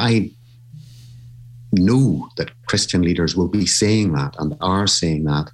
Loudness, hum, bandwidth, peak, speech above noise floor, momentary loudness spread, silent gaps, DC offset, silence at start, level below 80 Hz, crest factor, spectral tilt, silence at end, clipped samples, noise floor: -18 LUFS; none; 12.5 kHz; -4 dBFS; 24 dB; 9 LU; none; under 0.1%; 0 s; -42 dBFS; 14 dB; -4.5 dB/octave; 0.05 s; under 0.1%; -42 dBFS